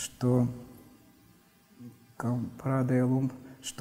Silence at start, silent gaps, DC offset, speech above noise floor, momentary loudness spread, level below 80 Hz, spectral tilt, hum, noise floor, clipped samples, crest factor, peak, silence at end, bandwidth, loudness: 0 s; none; under 0.1%; 32 dB; 24 LU; -64 dBFS; -6.5 dB/octave; none; -61 dBFS; under 0.1%; 18 dB; -14 dBFS; 0.05 s; 16 kHz; -30 LUFS